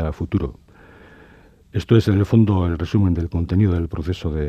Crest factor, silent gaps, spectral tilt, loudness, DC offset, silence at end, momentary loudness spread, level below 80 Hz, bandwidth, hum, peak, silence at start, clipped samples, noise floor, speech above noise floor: 18 dB; none; -9 dB/octave; -20 LUFS; under 0.1%; 0 s; 9 LU; -36 dBFS; 8.6 kHz; none; -2 dBFS; 0 s; under 0.1%; -49 dBFS; 30 dB